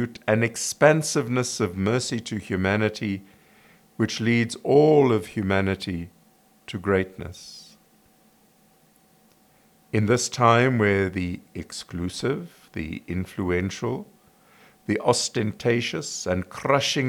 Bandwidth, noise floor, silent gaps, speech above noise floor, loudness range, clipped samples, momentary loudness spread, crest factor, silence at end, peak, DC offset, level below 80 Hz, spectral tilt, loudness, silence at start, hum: 19.5 kHz; -59 dBFS; none; 36 dB; 9 LU; under 0.1%; 16 LU; 22 dB; 0 s; -4 dBFS; under 0.1%; -60 dBFS; -5 dB/octave; -24 LUFS; 0 s; none